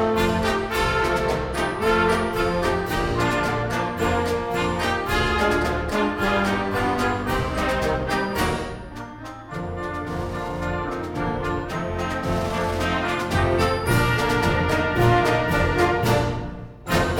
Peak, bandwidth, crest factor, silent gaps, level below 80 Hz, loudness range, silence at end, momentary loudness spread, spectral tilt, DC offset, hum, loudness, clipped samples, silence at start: -6 dBFS; 19 kHz; 18 dB; none; -34 dBFS; 7 LU; 0 s; 9 LU; -5.5 dB/octave; under 0.1%; none; -23 LUFS; under 0.1%; 0 s